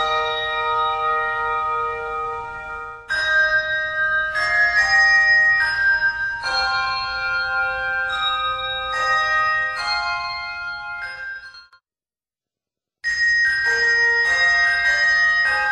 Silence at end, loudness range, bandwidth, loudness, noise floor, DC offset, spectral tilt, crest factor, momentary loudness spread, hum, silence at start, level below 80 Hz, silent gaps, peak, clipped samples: 0 s; 8 LU; 11.5 kHz; -18 LUFS; under -90 dBFS; under 0.1%; -0.5 dB/octave; 14 dB; 13 LU; none; 0 s; -48 dBFS; none; -6 dBFS; under 0.1%